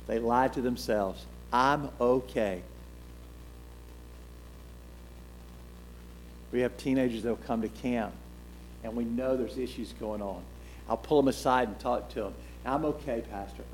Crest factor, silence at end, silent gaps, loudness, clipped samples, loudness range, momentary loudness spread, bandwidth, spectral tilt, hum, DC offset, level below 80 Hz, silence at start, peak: 22 dB; 0 s; none; -31 LUFS; under 0.1%; 14 LU; 23 LU; 18.5 kHz; -6 dB/octave; 60 Hz at -50 dBFS; under 0.1%; -48 dBFS; 0 s; -10 dBFS